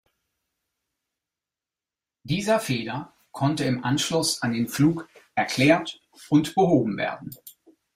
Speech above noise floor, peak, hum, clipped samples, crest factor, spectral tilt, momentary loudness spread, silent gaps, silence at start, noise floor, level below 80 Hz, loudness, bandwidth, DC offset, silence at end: over 67 dB; -6 dBFS; none; under 0.1%; 20 dB; -5 dB/octave; 16 LU; none; 2.25 s; under -90 dBFS; -60 dBFS; -24 LUFS; 16 kHz; under 0.1%; 0.45 s